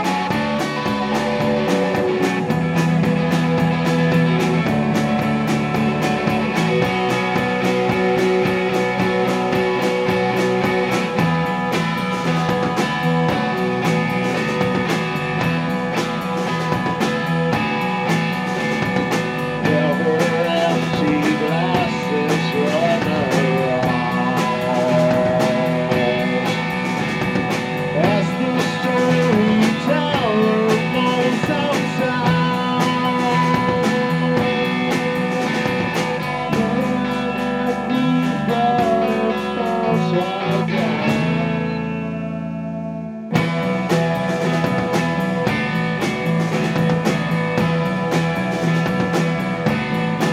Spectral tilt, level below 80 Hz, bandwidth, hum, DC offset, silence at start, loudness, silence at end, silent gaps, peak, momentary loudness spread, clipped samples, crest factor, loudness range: -6 dB/octave; -48 dBFS; 15 kHz; none; under 0.1%; 0 s; -19 LUFS; 0 s; none; -2 dBFS; 4 LU; under 0.1%; 16 dB; 2 LU